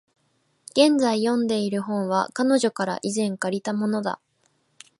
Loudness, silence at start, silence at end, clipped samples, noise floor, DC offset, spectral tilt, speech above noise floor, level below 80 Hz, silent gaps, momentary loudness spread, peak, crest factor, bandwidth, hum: -23 LUFS; 0.75 s; 0.85 s; under 0.1%; -68 dBFS; under 0.1%; -4.5 dB/octave; 46 dB; -72 dBFS; none; 8 LU; -4 dBFS; 20 dB; 11.5 kHz; none